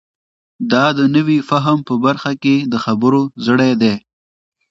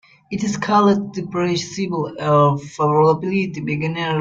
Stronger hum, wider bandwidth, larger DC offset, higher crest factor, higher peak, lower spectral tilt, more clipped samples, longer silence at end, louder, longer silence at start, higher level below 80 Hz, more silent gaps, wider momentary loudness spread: neither; about the same, 7.6 kHz vs 7.8 kHz; neither; about the same, 14 dB vs 16 dB; first, 0 dBFS vs -4 dBFS; about the same, -6.5 dB/octave vs -6 dB/octave; neither; first, 0.7 s vs 0 s; first, -15 LUFS vs -19 LUFS; first, 0.6 s vs 0.3 s; about the same, -58 dBFS vs -56 dBFS; neither; second, 5 LU vs 8 LU